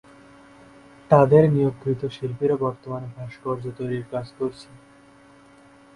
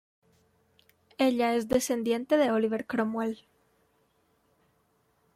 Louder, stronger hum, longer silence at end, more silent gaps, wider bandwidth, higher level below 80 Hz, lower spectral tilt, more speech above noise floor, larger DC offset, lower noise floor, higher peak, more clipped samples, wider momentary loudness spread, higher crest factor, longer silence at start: first, -23 LUFS vs -28 LUFS; neither; second, 1.3 s vs 2 s; neither; second, 11 kHz vs 15.5 kHz; first, -56 dBFS vs -66 dBFS; first, -9 dB/octave vs -4.5 dB/octave; second, 29 dB vs 44 dB; neither; second, -51 dBFS vs -70 dBFS; first, -2 dBFS vs -12 dBFS; neither; first, 17 LU vs 9 LU; about the same, 22 dB vs 18 dB; about the same, 1.1 s vs 1.2 s